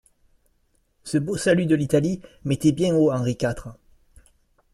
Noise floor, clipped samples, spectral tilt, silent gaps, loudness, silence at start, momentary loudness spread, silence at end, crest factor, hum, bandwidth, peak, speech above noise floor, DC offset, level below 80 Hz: -66 dBFS; under 0.1%; -6.5 dB/octave; none; -22 LUFS; 1.05 s; 12 LU; 1 s; 18 dB; none; 13 kHz; -6 dBFS; 45 dB; under 0.1%; -50 dBFS